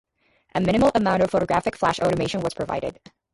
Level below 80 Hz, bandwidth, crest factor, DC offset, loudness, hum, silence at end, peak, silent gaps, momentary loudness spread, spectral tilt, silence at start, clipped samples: -48 dBFS; 11.5 kHz; 16 dB; under 0.1%; -22 LUFS; none; 0.4 s; -6 dBFS; none; 9 LU; -6 dB/octave; 0.55 s; under 0.1%